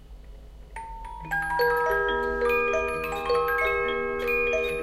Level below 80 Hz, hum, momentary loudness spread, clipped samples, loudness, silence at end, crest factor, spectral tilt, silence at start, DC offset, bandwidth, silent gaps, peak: -44 dBFS; none; 16 LU; under 0.1%; -25 LUFS; 0 s; 14 dB; -4.5 dB/octave; 0 s; under 0.1%; 15 kHz; none; -12 dBFS